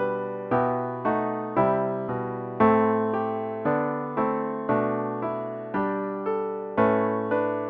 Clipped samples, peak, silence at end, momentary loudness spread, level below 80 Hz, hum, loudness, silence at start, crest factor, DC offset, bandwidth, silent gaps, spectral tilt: under 0.1%; -8 dBFS; 0 s; 8 LU; -60 dBFS; none; -26 LUFS; 0 s; 18 dB; under 0.1%; 4.5 kHz; none; -10.5 dB/octave